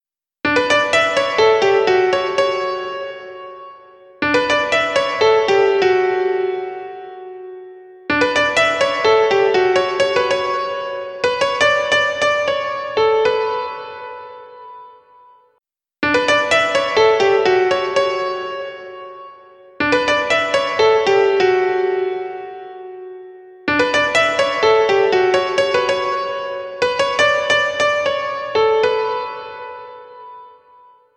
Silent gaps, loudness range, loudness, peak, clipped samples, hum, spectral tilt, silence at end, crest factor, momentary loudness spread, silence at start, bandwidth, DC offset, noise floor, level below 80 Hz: none; 3 LU; -16 LUFS; 0 dBFS; under 0.1%; none; -3 dB/octave; 0.7 s; 16 dB; 19 LU; 0.45 s; 10 kHz; under 0.1%; -68 dBFS; -54 dBFS